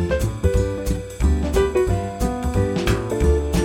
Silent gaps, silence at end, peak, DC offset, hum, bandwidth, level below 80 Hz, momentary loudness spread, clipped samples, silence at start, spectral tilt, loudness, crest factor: none; 0 s; -4 dBFS; under 0.1%; none; 16.5 kHz; -24 dBFS; 5 LU; under 0.1%; 0 s; -6.5 dB/octave; -21 LUFS; 14 dB